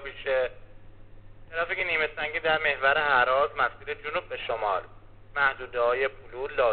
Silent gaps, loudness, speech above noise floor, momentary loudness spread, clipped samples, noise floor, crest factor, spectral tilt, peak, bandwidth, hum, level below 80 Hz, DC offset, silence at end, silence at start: none; -27 LUFS; 20 dB; 11 LU; under 0.1%; -47 dBFS; 20 dB; 0 dB/octave; -8 dBFS; 4.6 kHz; none; -50 dBFS; 0.2%; 0 s; 0 s